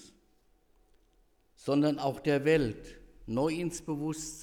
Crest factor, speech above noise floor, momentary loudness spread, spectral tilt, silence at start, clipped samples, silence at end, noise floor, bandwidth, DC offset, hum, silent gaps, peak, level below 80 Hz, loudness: 18 dB; 37 dB; 12 LU; -5.5 dB/octave; 0 s; under 0.1%; 0 s; -67 dBFS; 16.5 kHz; under 0.1%; none; none; -14 dBFS; -56 dBFS; -31 LUFS